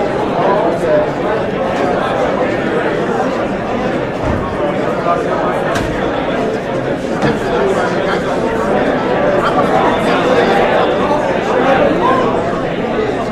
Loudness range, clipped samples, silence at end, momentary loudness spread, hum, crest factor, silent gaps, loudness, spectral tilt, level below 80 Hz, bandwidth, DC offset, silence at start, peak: 4 LU; under 0.1%; 0 s; 5 LU; none; 12 dB; none; -14 LUFS; -6 dB/octave; -36 dBFS; 13 kHz; under 0.1%; 0 s; -2 dBFS